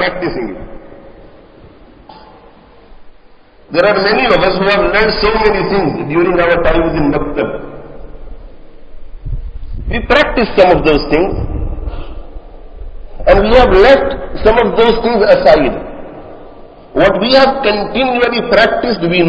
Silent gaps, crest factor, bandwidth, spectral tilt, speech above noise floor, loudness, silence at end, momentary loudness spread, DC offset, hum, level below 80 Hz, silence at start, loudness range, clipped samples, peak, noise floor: none; 12 dB; 8 kHz; -7 dB/octave; 31 dB; -11 LUFS; 0 s; 19 LU; under 0.1%; none; -26 dBFS; 0 s; 8 LU; 0.6%; 0 dBFS; -41 dBFS